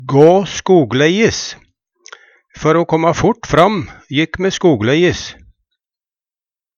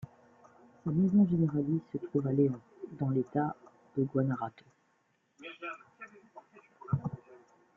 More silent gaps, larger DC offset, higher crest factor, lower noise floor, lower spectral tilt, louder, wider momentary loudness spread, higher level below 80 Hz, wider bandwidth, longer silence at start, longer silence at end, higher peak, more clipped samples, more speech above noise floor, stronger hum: neither; neither; about the same, 14 dB vs 18 dB; first, under -90 dBFS vs -74 dBFS; second, -5.5 dB/octave vs -10.5 dB/octave; first, -13 LUFS vs -32 LUFS; second, 11 LU vs 22 LU; first, -42 dBFS vs -68 dBFS; first, 8.6 kHz vs 4 kHz; about the same, 0 s vs 0 s; first, 1.45 s vs 0.4 s; first, 0 dBFS vs -16 dBFS; neither; first, over 77 dB vs 44 dB; neither